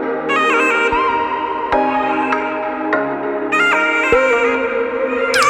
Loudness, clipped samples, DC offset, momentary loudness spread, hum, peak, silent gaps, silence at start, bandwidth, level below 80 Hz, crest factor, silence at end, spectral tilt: -16 LUFS; under 0.1%; under 0.1%; 6 LU; none; 0 dBFS; none; 0 s; 15.5 kHz; -44 dBFS; 16 dB; 0 s; -3 dB/octave